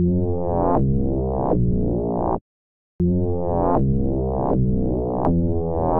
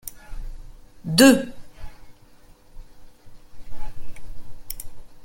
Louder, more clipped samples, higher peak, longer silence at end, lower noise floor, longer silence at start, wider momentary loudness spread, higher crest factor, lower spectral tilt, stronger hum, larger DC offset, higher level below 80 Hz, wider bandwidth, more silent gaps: second, -22 LUFS vs -16 LUFS; neither; second, -8 dBFS vs -2 dBFS; about the same, 0 s vs 0 s; first, under -90 dBFS vs -49 dBFS; about the same, 0 s vs 0.05 s; second, 3 LU vs 29 LU; second, 12 dB vs 22 dB; first, -14.5 dB/octave vs -4 dB/octave; neither; neither; first, -30 dBFS vs -40 dBFS; second, 2.6 kHz vs 17 kHz; first, 2.41-2.99 s vs none